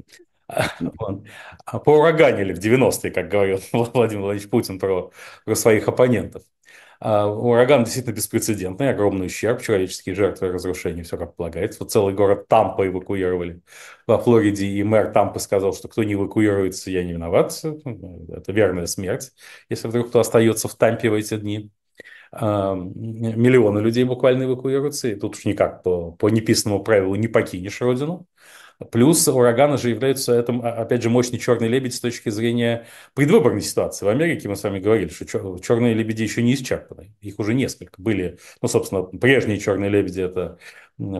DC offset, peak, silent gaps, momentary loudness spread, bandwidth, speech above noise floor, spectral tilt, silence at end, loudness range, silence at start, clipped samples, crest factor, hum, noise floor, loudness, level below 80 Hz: under 0.1%; 0 dBFS; none; 13 LU; 12.5 kHz; 26 dB; -5.5 dB/octave; 0 s; 4 LU; 0.5 s; under 0.1%; 20 dB; none; -46 dBFS; -20 LUFS; -52 dBFS